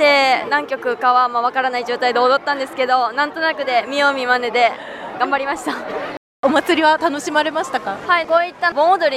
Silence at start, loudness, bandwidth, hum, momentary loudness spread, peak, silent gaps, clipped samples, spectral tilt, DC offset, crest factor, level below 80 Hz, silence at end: 0 s; -17 LUFS; 14 kHz; none; 8 LU; -2 dBFS; 6.17-6.43 s; under 0.1%; -2.5 dB/octave; under 0.1%; 14 dB; -62 dBFS; 0 s